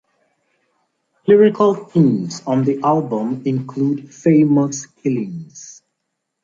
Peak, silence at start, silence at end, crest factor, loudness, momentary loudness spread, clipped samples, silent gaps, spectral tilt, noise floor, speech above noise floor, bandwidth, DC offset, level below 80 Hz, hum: -2 dBFS; 1.25 s; 0.7 s; 16 dB; -17 LUFS; 14 LU; under 0.1%; none; -7.5 dB/octave; -76 dBFS; 59 dB; 7.6 kHz; under 0.1%; -64 dBFS; none